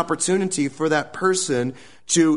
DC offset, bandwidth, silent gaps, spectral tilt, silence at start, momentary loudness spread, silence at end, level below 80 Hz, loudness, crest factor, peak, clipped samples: 0.4%; 11 kHz; none; -4 dB/octave; 0 s; 5 LU; 0 s; -62 dBFS; -22 LUFS; 16 dB; -6 dBFS; under 0.1%